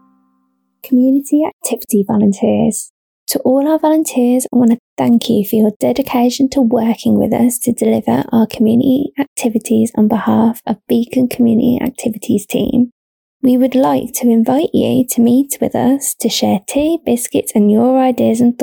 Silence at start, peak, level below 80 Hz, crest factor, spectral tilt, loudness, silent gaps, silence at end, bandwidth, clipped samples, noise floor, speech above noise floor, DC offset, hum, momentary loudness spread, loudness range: 0.85 s; -4 dBFS; -50 dBFS; 10 dB; -5.5 dB/octave; -14 LUFS; 1.53-1.60 s, 2.90-3.27 s, 4.80-4.97 s, 5.76-5.80 s, 9.27-9.36 s, 12.92-13.40 s; 0 s; 19.5 kHz; under 0.1%; -62 dBFS; 49 dB; under 0.1%; none; 5 LU; 1 LU